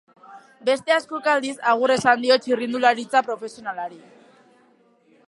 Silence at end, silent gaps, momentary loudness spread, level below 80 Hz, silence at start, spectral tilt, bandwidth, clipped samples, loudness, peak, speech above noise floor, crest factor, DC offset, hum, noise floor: 1.3 s; none; 13 LU; -70 dBFS; 0.3 s; -3.5 dB/octave; 11.5 kHz; under 0.1%; -21 LUFS; -2 dBFS; 37 dB; 20 dB; under 0.1%; none; -58 dBFS